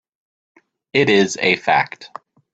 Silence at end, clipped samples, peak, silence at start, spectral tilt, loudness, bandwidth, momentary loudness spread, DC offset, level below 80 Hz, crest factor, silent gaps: 0.5 s; under 0.1%; -2 dBFS; 0.95 s; -4 dB/octave; -17 LUFS; 8.4 kHz; 17 LU; under 0.1%; -62 dBFS; 18 dB; none